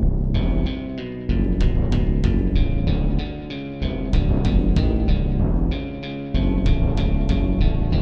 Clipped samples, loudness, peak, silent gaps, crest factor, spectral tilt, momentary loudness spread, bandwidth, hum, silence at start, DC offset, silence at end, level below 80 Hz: under 0.1%; -22 LUFS; -6 dBFS; none; 14 dB; -8.5 dB/octave; 8 LU; 6.6 kHz; none; 0 s; 0.8%; 0 s; -20 dBFS